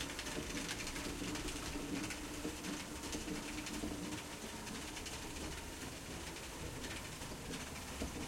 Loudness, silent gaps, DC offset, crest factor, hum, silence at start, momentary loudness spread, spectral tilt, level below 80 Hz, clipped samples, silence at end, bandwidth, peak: -44 LUFS; none; under 0.1%; 18 dB; none; 0 s; 4 LU; -3 dB/octave; -54 dBFS; under 0.1%; 0 s; 16.5 kHz; -26 dBFS